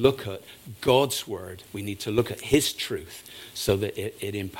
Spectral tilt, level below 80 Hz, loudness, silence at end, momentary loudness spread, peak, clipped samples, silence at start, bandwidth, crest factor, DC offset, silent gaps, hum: -4.5 dB/octave; -52 dBFS; -27 LUFS; 0 s; 16 LU; -4 dBFS; under 0.1%; 0 s; 17 kHz; 22 dB; under 0.1%; none; none